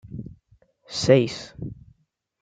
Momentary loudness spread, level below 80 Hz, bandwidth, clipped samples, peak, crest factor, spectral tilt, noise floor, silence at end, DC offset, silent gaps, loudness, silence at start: 20 LU; -54 dBFS; 9.4 kHz; under 0.1%; -4 dBFS; 22 dB; -5.5 dB/octave; -66 dBFS; 0.7 s; under 0.1%; none; -22 LUFS; 0.05 s